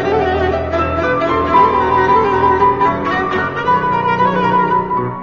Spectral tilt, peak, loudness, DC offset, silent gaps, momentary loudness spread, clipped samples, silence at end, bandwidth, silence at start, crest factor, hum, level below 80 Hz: -7 dB/octave; 0 dBFS; -14 LUFS; 0.5%; none; 5 LU; under 0.1%; 0 s; 7.2 kHz; 0 s; 14 dB; none; -34 dBFS